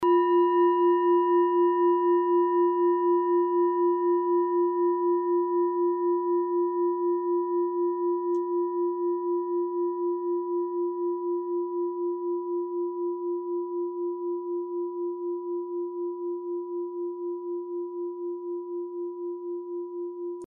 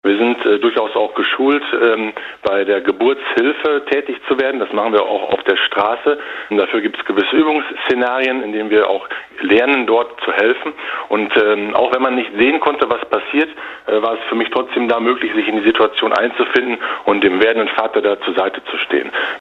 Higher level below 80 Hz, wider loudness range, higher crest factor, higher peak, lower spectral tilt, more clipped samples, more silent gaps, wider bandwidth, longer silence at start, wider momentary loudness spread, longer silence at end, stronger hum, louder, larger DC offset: second, -84 dBFS vs -58 dBFS; first, 10 LU vs 2 LU; about the same, 12 dB vs 14 dB; second, -14 dBFS vs 0 dBFS; second, -3.5 dB/octave vs -5.5 dB/octave; neither; neither; second, 3 kHz vs 6.6 kHz; about the same, 0 s vs 0.05 s; first, 12 LU vs 6 LU; about the same, 0 s vs 0 s; neither; second, -27 LUFS vs -16 LUFS; neither